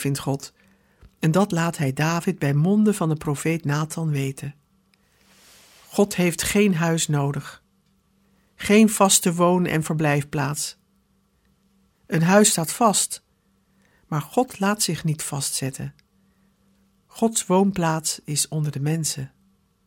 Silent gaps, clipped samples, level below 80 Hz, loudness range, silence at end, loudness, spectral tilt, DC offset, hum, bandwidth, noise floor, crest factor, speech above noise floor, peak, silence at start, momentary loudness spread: none; under 0.1%; -56 dBFS; 6 LU; 0.6 s; -22 LUFS; -4.5 dB/octave; under 0.1%; none; 17.5 kHz; -64 dBFS; 22 dB; 43 dB; -2 dBFS; 0 s; 13 LU